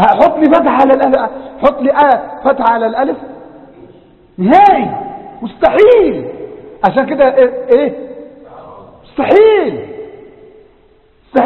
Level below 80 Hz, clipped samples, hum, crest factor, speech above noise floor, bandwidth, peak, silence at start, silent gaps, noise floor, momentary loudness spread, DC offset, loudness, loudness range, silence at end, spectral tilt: -46 dBFS; 0.4%; none; 12 dB; 38 dB; 6 kHz; 0 dBFS; 0 s; none; -48 dBFS; 20 LU; under 0.1%; -10 LUFS; 4 LU; 0 s; -8 dB/octave